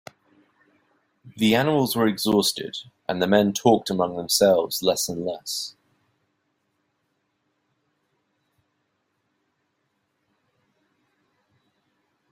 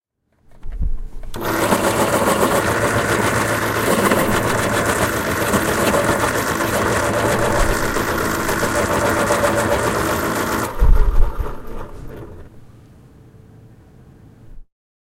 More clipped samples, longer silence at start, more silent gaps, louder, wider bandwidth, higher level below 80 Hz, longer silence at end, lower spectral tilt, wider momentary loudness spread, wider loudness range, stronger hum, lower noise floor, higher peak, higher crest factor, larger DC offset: neither; first, 1.25 s vs 0.5 s; neither; second, -22 LUFS vs -18 LUFS; about the same, 16 kHz vs 16.5 kHz; second, -64 dBFS vs -24 dBFS; first, 6.6 s vs 0.4 s; about the same, -4 dB/octave vs -4.5 dB/octave; about the same, 11 LU vs 13 LU; first, 12 LU vs 7 LU; neither; first, -74 dBFS vs -55 dBFS; second, -4 dBFS vs 0 dBFS; first, 24 dB vs 18 dB; neither